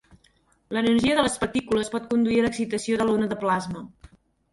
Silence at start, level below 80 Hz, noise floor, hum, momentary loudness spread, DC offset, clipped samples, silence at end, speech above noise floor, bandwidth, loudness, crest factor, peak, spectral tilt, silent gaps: 0.7 s; -52 dBFS; -63 dBFS; none; 9 LU; under 0.1%; under 0.1%; 0.65 s; 40 dB; 11.5 kHz; -24 LUFS; 18 dB; -6 dBFS; -4.5 dB/octave; none